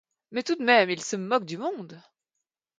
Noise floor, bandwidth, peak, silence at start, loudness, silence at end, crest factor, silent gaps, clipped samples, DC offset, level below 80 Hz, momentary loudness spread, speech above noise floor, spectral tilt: -85 dBFS; 9.4 kHz; -8 dBFS; 0.3 s; -25 LUFS; 0.8 s; 20 dB; none; under 0.1%; under 0.1%; -80 dBFS; 15 LU; 59 dB; -3.5 dB/octave